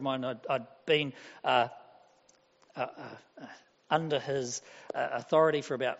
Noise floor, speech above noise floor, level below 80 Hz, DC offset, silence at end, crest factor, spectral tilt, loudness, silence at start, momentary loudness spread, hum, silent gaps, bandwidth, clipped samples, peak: -66 dBFS; 34 dB; -78 dBFS; under 0.1%; 0 s; 20 dB; -3 dB/octave; -31 LUFS; 0 s; 21 LU; none; none; 8 kHz; under 0.1%; -12 dBFS